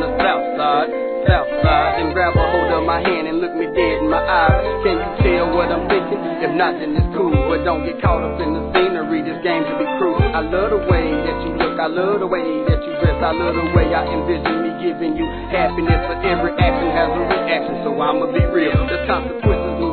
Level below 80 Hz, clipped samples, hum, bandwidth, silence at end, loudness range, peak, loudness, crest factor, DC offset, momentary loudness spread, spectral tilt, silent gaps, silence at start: -28 dBFS; under 0.1%; none; 4.6 kHz; 0 s; 2 LU; 0 dBFS; -18 LUFS; 16 dB; 0.2%; 4 LU; -10 dB/octave; none; 0 s